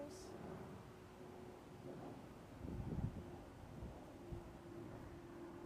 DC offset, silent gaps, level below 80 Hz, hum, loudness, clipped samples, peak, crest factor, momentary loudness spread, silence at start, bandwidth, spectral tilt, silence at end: under 0.1%; none; -62 dBFS; none; -53 LUFS; under 0.1%; -32 dBFS; 20 dB; 10 LU; 0 s; 15.5 kHz; -7 dB/octave; 0 s